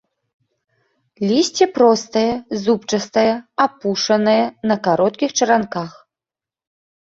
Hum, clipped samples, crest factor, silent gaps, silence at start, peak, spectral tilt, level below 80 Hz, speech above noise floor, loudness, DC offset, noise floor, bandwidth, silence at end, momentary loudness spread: none; under 0.1%; 16 dB; none; 1.2 s; -2 dBFS; -4 dB/octave; -60 dBFS; 73 dB; -17 LUFS; under 0.1%; -90 dBFS; 8 kHz; 1.1 s; 6 LU